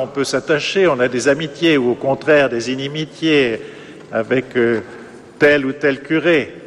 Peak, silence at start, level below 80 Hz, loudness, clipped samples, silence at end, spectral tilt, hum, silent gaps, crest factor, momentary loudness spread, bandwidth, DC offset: -2 dBFS; 0 s; -54 dBFS; -16 LUFS; under 0.1%; 0 s; -5 dB/octave; none; none; 16 dB; 10 LU; 12.5 kHz; under 0.1%